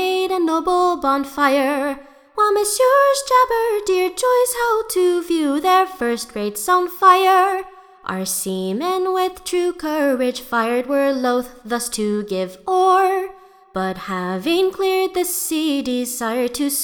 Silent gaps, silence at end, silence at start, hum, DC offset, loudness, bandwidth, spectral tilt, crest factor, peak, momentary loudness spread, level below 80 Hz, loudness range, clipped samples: none; 0 s; 0 s; none; under 0.1%; -18 LUFS; 20 kHz; -3.5 dB/octave; 18 dB; 0 dBFS; 10 LU; -54 dBFS; 4 LU; under 0.1%